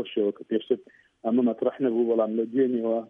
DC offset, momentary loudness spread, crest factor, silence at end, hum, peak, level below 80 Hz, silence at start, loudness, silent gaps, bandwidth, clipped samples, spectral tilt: under 0.1%; 7 LU; 14 dB; 0.05 s; none; -10 dBFS; -80 dBFS; 0 s; -26 LUFS; none; 3.7 kHz; under 0.1%; -9 dB/octave